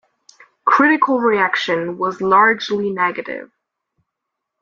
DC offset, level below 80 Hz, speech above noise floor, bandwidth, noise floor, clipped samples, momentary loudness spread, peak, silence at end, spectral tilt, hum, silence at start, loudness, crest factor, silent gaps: under 0.1%; -64 dBFS; 63 dB; 7.4 kHz; -79 dBFS; under 0.1%; 10 LU; -2 dBFS; 1.15 s; -5 dB/octave; none; 0.65 s; -16 LUFS; 16 dB; none